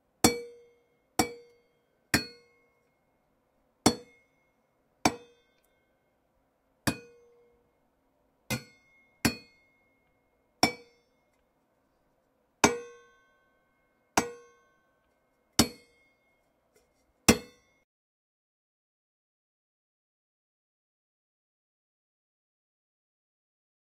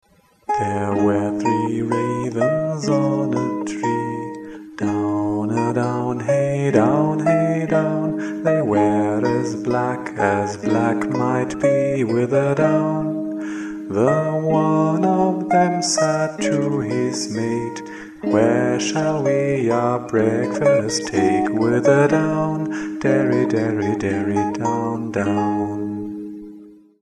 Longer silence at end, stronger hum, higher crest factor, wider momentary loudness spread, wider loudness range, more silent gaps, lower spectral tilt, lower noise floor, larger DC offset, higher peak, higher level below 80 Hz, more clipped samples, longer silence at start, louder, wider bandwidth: first, 6.4 s vs 0.25 s; neither; first, 32 dB vs 18 dB; first, 18 LU vs 8 LU; first, 7 LU vs 4 LU; neither; second, -3 dB/octave vs -6 dB/octave; first, -73 dBFS vs -43 dBFS; neither; about the same, -4 dBFS vs -2 dBFS; about the same, -58 dBFS vs -56 dBFS; neither; second, 0.25 s vs 0.5 s; second, -30 LUFS vs -20 LUFS; first, 16 kHz vs 11 kHz